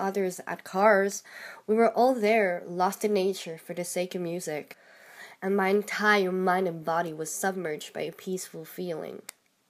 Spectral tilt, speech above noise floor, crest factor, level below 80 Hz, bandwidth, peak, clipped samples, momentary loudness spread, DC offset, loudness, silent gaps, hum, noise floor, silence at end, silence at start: -4.5 dB/octave; 22 dB; 20 dB; -82 dBFS; 15.5 kHz; -8 dBFS; under 0.1%; 15 LU; under 0.1%; -28 LUFS; none; none; -50 dBFS; 0.5 s; 0 s